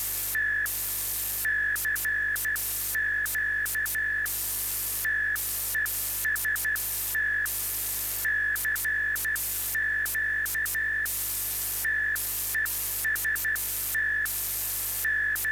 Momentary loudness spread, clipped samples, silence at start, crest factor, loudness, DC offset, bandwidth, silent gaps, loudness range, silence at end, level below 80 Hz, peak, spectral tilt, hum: 2 LU; under 0.1%; 0 s; 10 dB; -26 LUFS; under 0.1%; over 20 kHz; none; 0 LU; 0 s; -50 dBFS; -20 dBFS; 0.5 dB/octave; 50 Hz at -50 dBFS